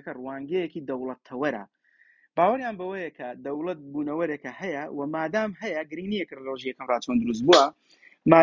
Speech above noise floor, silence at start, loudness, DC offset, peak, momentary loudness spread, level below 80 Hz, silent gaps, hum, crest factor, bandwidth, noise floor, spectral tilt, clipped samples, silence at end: 34 dB; 0.05 s; -27 LUFS; under 0.1%; -2 dBFS; 15 LU; -64 dBFS; none; none; 24 dB; 7.6 kHz; -62 dBFS; -5 dB/octave; under 0.1%; 0 s